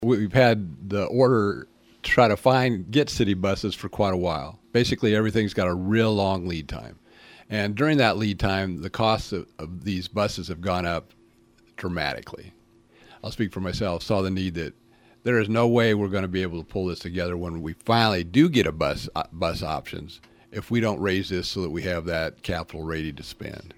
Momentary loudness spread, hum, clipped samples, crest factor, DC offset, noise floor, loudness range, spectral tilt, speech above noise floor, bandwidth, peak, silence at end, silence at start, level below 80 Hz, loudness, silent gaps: 14 LU; none; under 0.1%; 22 dB; under 0.1%; -58 dBFS; 7 LU; -6 dB/octave; 34 dB; 16 kHz; -2 dBFS; 0.05 s; 0 s; -46 dBFS; -24 LUFS; none